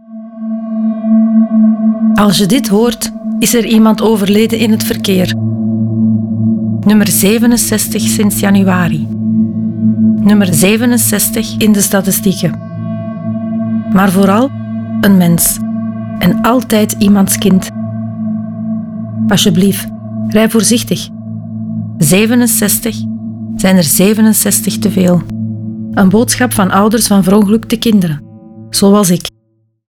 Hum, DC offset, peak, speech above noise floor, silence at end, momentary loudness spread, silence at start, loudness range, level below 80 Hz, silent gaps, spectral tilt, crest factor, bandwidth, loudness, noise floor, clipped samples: none; under 0.1%; 0 dBFS; 48 dB; 0.7 s; 12 LU; 0.1 s; 2 LU; -40 dBFS; none; -5 dB/octave; 10 dB; 19.5 kHz; -11 LUFS; -57 dBFS; under 0.1%